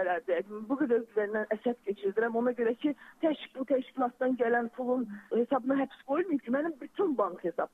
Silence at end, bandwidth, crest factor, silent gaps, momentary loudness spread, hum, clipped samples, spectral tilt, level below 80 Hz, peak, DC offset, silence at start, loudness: 0.05 s; 4.1 kHz; 14 dB; none; 5 LU; none; under 0.1%; -7.5 dB/octave; -78 dBFS; -16 dBFS; under 0.1%; 0 s; -31 LUFS